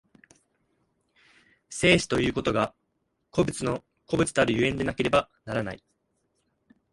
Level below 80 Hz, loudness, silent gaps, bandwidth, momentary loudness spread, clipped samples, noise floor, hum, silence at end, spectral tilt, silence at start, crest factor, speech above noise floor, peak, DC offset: -50 dBFS; -26 LUFS; none; 11.5 kHz; 11 LU; under 0.1%; -76 dBFS; none; 1.15 s; -4.5 dB/octave; 1.7 s; 22 dB; 51 dB; -6 dBFS; under 0.1%